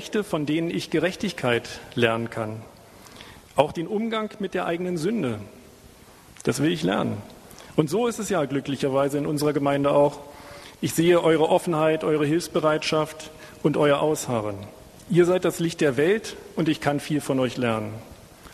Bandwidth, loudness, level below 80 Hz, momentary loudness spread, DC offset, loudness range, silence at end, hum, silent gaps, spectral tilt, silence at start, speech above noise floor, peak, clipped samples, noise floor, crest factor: 13.5 kHz; -24 LUFS; -56 dBFS; 16 LU; under 0.1%; 6 LU; 0 s; none; none; -5.5 dB/octave; 0 s; 26 dB; -4 dBFS; under 0.1%; -49 dBFS; 22 dB